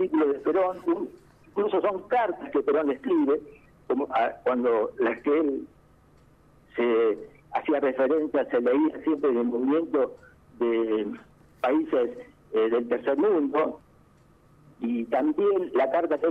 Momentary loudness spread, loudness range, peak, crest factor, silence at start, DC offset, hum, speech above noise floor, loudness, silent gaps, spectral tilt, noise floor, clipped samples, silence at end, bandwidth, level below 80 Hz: 7 LU; 2 LU; -12 dBFS; 14 dB; 0 s; under 0.1%; none; 33 dB; -26 LUFS; none; -7.5 dB/octave; -58 dBFS; under 0.1%; 0 s; 4.8 kHz; -64 dBFS